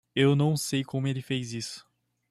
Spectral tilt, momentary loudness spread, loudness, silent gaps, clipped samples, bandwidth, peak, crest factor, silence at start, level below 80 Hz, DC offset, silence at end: -5.5 dB/octave; 14 LU; -28 LUFS; none; under 0.1%; 14 kHz; -12 dBFS; 18 dB; 0.15 s; -66 dBFS; under 0.1%; 0.5 s